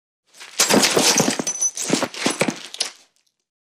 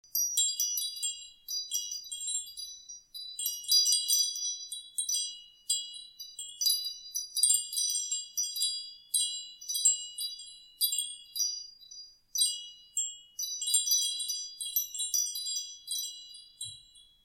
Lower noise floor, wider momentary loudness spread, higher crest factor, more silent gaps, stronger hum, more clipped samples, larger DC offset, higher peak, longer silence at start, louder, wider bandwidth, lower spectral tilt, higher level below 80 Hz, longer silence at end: about the same, -60 dBFS vs -57 dBFS; second, 12 LU vs 17 LU; about the same, 18 dB vs 22 dB; neither; neither; neither; neither; first, -4 dBFS vs -12 dBFS; first, 0.4 s vs 0.15 s; first, -19 LUFS vs -30 LUFS; about the same, 16 kHz vs 16.5 kHz; first, -2 dB/octave vs 5.5 dB/octave; first, -64 dBFS vs -76 dBFS; first, 0.75 s vs 0.2 s